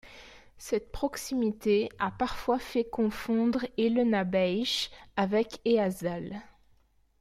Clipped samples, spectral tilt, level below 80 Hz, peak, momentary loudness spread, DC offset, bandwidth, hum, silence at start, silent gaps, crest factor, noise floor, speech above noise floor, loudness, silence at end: under 0.1%; -5 dB/octave; -54 dBFS; -14 dBFS; 8 LU; under 0.1%; 15.5 kHz; none; 0.05 s; none; 16 dB; -65 dBFS; 36 dB; -29 LUFS; 0.75 s